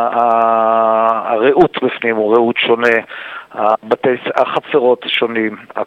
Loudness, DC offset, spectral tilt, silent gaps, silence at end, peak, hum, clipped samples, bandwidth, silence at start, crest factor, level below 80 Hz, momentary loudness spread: -14 LUFS; under 0.1%; -6 dB/octave; none; 0 s; 0 dBFS; none; under 0.1%; 8 kHz; 0 s; 14 dB; -56 dBFS; 6 LU